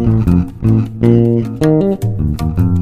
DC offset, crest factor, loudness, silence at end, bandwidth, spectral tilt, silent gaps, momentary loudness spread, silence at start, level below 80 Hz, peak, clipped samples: under 0.1%; 12 dB; -14 LUFS; 0 s; 13 kHz; -9.5 dB/octave; none; 6 LU; 0 s; -26 dBFS; 0 dBFS; under 0.1%